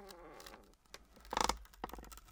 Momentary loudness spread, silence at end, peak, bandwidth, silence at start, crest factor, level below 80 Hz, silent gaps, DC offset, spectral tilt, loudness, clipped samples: 21 LU; 0 s; -16 dBFS; 18 kHz; 0 s; 30 dB; -56 dBFS; none; under 0.1%; -2 dB/octave; -41 LUFS; under 0.1%